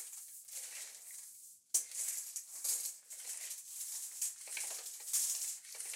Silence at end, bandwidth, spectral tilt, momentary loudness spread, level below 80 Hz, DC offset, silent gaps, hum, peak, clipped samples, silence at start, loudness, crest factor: 0 s; 16.5 kHz; 5 dB/octave; 13 LU; under -90 dBFS; under 0.1%; none; none; -18 dBFS; under 0.1%; 0 s; -39 LUFS; 26 dB